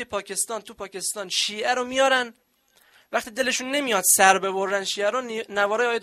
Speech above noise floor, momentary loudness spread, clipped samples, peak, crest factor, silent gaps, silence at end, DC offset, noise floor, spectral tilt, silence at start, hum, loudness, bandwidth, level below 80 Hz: 37 dB; 12 LU; under 0.1%; -2 dBFS; 22 dB; none; 0 s; under 0.1%; -61 dBFS; -1 dB/octave; 0 s; none; -22 LUFS; 15.5 kHz; -66 dBFS